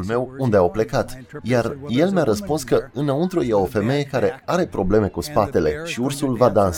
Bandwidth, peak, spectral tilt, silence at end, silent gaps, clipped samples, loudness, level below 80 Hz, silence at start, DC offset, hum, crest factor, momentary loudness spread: 18.5 kHz; -2 dBFS; -6.5 dB/octave; 0 s; none; under 0.1%; -21 LUFS; -42 dBFS; 0 s; under 0.1%; none; 18 dB; 5 LU